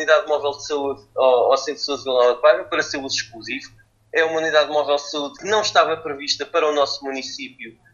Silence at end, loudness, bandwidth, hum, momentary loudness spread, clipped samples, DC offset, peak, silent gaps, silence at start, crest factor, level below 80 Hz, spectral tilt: 0.25 s; -20 LUFS; 7.4 kHz; none; 12 LU; under 0.1%; under 0.1%; 0 dBFS; none; 0 s; 20 dB; -62 dBFS; -2 dB/octave